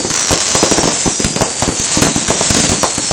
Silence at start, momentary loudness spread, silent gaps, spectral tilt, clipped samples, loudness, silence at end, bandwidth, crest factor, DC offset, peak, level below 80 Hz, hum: 0 s; 4 LU; none; -2 dB/octave; under 0.1%; -12 LUFS; 0 s; over 20 kHz; 14 dB; under 0.1%; 0 dBFS; -32 dBFS; none